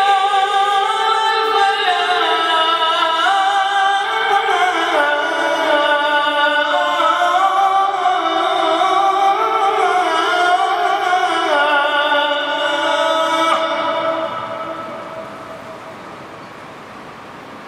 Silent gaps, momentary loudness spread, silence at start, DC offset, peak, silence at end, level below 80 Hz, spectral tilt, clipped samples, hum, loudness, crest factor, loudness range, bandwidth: none; 18 LU; 0 s; under 0.1%; -2 dBFS; 0 s; -66 dBFS; -1.5 dB/octave; under 0.1%; none; -15 LUFS; 14 dB; 6 LU; 15 kHz